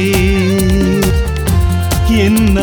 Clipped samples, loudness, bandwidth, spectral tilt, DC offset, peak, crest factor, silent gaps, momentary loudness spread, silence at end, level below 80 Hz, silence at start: under 0.1%; -12 LUFS; over 20 kHz; -6 dB/octave; under 0.1%; 0 dBFS; 10 dB; none; 3 LU; 0 s; -18 dBFS; 0 s